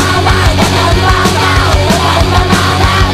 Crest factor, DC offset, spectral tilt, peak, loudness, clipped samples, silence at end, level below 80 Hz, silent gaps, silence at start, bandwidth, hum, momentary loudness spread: 8 dB; under 0.1%; -4.5 dB/octave; 0 dBFS; -9 LUFS; 0.6%; 0 s; -16 dBFS; none; 0 s; 14.5 kHz; none; 1 LU